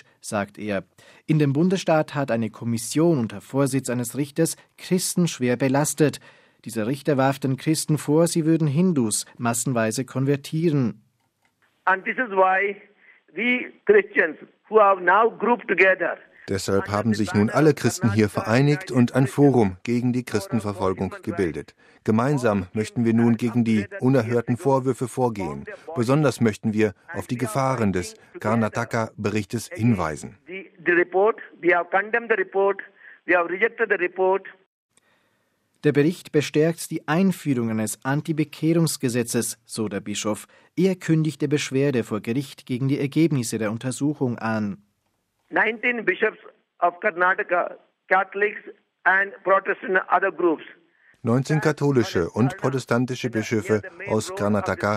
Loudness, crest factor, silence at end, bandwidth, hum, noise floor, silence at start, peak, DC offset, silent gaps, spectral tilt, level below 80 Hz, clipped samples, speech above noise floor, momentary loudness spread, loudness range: -23 LUFS; 18 dB; 0 s; 15.5 kHz; none; -72 dBFS; 0.25 s; -4 dBFS; under 0.1%; 34.66-34.89 s; -5.5 dB/octave; -62 dBFS; under 0.1%; 50 dB; 9 LU; 4 LU